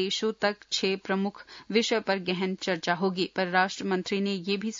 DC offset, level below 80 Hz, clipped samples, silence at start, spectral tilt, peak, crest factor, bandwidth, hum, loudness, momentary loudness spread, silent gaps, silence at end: under 0.1%; -72 dBFS; under 0.1%; 0 s; -4 dB/octave; -10 dBFS; 18 dB; 7.6 kHz; none; -28 LUFS; 4 LU; none; 0 s